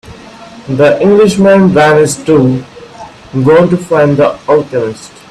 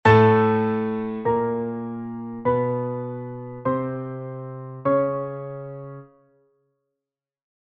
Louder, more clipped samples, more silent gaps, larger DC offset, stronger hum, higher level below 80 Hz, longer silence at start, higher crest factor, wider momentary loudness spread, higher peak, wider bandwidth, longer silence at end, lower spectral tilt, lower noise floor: first, -8 LUFS vs -24 LUFS; neither; neither; neither; neither; first, -44 dBFS vs -56 dBFS; about the same, 0.05 s vs 0.05 s; second, 10 dB vs 22 dB; second, 13 LU vs 16 LU; about the same, 0 dBFS vs -2 dBFS; first, 13 kHz vs 6.8 kHz; second, 0.25 s vs 1.75 s; second, -6.5 dB/octave vs -9 dB/octave; second, -31 dBFS vs -88 dBFS